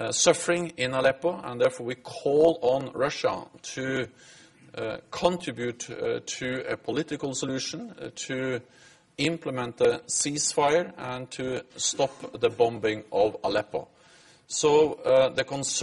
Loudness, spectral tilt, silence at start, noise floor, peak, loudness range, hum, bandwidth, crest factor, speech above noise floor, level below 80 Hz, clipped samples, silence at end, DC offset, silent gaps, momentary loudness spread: -27 LUFS; -3.5 dB/octave; 0 s; -56 dBFS; -6 dBFS; 6 LU; none; 11.5 kHz; 20 dB; 29 dB; -62 dBFS; under 0.1%; 0 s; under 0.1%; none; 13 LU